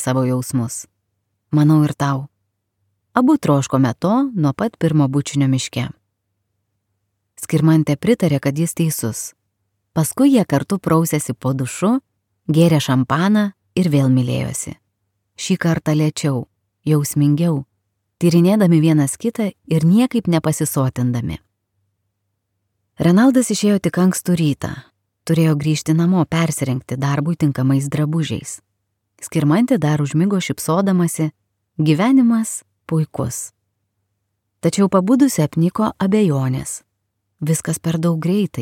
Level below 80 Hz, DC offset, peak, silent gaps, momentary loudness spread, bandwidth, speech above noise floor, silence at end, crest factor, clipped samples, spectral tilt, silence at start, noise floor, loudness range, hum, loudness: -54 dBFS; under 0.1%; 0 dBFS; none; 11 LU; 16.5 kHz; 57 dB; 0 s; 16 dB; under 0.1%; -6.5 dB/octave; 0 s; -73 dBFS; 3 LU; none; -17 LUFS